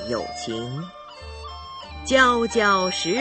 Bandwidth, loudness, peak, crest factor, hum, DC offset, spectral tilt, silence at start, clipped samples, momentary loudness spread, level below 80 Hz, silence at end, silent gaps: 8.8 kHz; -21 LUFS; -4 dBFS; 20 dB; none; under 0.1%; -3.5 dB/octave; 0 s; under 0.1%; 20 LU; -44 dBFS; 0 s; none